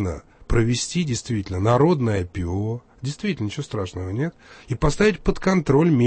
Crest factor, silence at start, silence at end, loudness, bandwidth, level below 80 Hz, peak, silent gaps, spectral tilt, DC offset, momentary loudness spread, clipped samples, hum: 16 dB; 0 s; 0 s; -23 LUFS; 8.8 kHz; -36 dBFS; -6 dBFS; none; -6 dB/octave; under 0.1%; 11 LU; under 0.1%; none